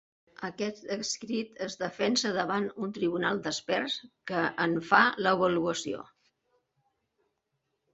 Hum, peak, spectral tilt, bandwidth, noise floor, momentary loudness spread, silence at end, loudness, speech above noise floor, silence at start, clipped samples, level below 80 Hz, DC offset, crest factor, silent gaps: none; -6 dBFS; -3.5 dB/octave; 8.2 kHz; -81 dBFS; 12 LU; 1.9 s; -29 LUFS; 51 dB; 0.4 s; under 0.1%; -72 dBFS; under 0.1%; 24 dB; none